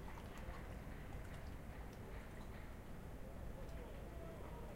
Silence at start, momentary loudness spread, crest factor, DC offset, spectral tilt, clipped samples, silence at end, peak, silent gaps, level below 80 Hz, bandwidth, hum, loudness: 0 s; 2 LU; 14 dB; under 0.1%; -6.5 dB/octave; under 0.1%; 0 s; -36 dBFS; none; -54 dBFS; 16 kHz; none; -53 LUFS